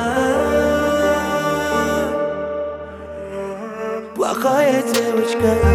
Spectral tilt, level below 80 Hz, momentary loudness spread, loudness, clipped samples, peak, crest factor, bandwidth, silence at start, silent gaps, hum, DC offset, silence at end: -5 dB/octave; -34 dBFS; 12 LU; -19 LUFS; under 0.1%; -2 dBFS; 16 dB; 16.5 kHz; 0 s; none; none; under 0.1%; 0 s